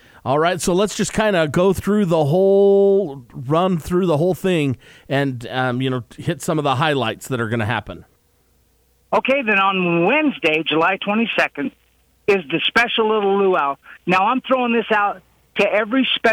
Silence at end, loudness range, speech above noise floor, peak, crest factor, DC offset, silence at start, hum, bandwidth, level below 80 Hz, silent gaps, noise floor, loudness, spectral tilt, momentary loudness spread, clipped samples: 0 s; 5 LU; 42 dB; -4 dBFS; 14 dB; under 0.1%; 0.25 s; none; 16.5 kHz; -50 dBFS; none; -59 dBFS; -18 LUFS; -5.5 dB/octave; 8 LU; under 0.1%